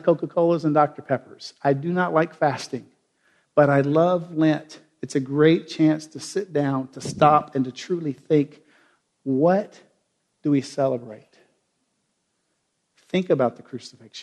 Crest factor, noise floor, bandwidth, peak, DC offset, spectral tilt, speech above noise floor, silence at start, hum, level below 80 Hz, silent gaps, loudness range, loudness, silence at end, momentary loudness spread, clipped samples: 22 dB; -73 dBFS; 11.5 kHz; -2 dBFS; under 0.1%; -7 dB/octave; 52 dB; 0.05 s; none; -66 dBFS; none; 7 LU; -22 LUFS; 0 s; 14 LU; under 0.1%